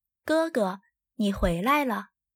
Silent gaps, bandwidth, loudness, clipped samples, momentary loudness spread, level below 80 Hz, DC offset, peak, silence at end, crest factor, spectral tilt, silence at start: none; 17 kHz; -27 LUFS; under 0.1%; 8 LU; -42 dBFS; under 0.1%; -12 dBFS; 0.3 s; 16 dB; -6 dB/octave; 0.25 s